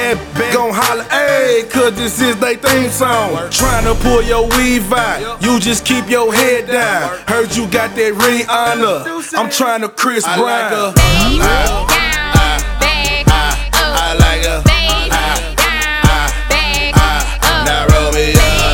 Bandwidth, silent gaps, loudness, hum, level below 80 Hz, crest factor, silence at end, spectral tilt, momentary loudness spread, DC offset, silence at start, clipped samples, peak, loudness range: 19.5 kHz; none; -12 LUFS; none; -20 dBFS; 12 dB; 0 s; -3.5 dB/octave; 4 LU; under 0.1%; 0 s; 0.1%; 0 dBFS; 2 LU